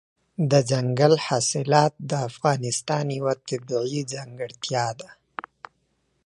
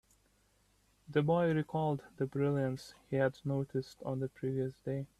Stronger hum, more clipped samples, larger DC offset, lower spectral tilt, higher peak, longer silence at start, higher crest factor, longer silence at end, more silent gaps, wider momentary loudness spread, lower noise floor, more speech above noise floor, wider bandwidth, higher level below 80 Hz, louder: second, none vs 50 Hz at -70 dBFS; neither; neither; second, -5 dB/octave vs -8 dB/octave; first, -2 dBFS vs -18 dBFS; second, 0.4 s vs 1.1 s; about the same, 22 dB vs 18 dB; first, 1.1 s vs 0.15 s; neither; first, 18 LU vs 8 LU; about the same, -70 dBFS vs -71 dBFS; first, 47 dB vs 37 dB; about the same, 11.5 kHz vs 12.5 kHz; about the same, -68 dBFS vs -68 dBFS; first, -24 LUFS vs -35 LUFS